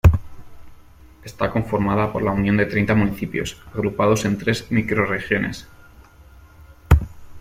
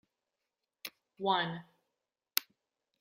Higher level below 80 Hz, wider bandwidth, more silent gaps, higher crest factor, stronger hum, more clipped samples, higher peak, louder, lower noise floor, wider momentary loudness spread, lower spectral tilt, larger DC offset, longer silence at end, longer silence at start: first, -32 dBFS vs -88 dBFS; about the same, 16 kHz vs 16 kHz; neither; second, 20 dB vs 38 dB; neither; neither; about the same, -2 dBFS vs -2 dBFS; first, -21 LUFS vs -34 LUFS; second, -46 dBFS vs -88 dBFS; second, 10 LU vs 16 LU; first, -6.5 dB/octave vs -3 dB/octave; neither; second, 0 s vs 0.6 s; second, 0.05 s vs 0.85 s